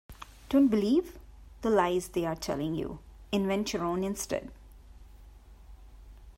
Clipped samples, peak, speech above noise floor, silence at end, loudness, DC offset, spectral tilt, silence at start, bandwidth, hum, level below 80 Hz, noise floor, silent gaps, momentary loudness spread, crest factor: under 0.1%; -14 dBFS; 23 dB; 0.05 s; -30 LUFS; under 0.1%; -5.5 dB/octave; 0.1 s; 16 kHz; none; -52 dBFS; -52 dBFS; none; 21 LU; 18 dB